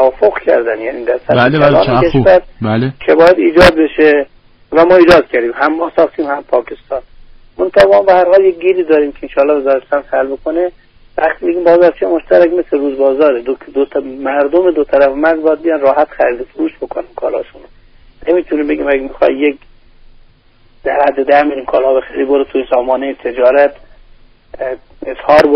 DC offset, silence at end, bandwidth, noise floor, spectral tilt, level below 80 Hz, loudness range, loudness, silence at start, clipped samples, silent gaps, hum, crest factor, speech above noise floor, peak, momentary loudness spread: under 0.1%; 0 s; 6.4 kHz; -46 dBFS; -4.5 dB/octave; -38 dBFS; 7 LU; -11 LUFS; 0 s; under 0.1%; none; none; 12 dB; 35 dB; 0 dBFS; 12 LU